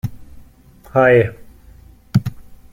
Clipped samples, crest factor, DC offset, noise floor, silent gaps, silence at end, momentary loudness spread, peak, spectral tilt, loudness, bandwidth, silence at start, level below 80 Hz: under 0.1%; 18 dB; under 0.1%; -45 dBFS; none; 0.2 s; 16 LU; -2 dBFS; -8 dB/octave; -16 LUFS; 16.5 kHz; 0.05 s; -44 dBFS